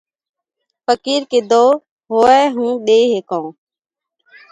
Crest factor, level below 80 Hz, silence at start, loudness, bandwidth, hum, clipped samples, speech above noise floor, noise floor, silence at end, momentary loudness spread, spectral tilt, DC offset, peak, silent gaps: 16 dB; -60 dBFS; 0.9 s; -14 LUFS; 9.4 kHz; none; under 0.1%; 72 dB; -85 dBFS; 1 s; 13 LU; -3.5 dB/octave; under 0.1%; 0 dBFS; 1.91-1.97 s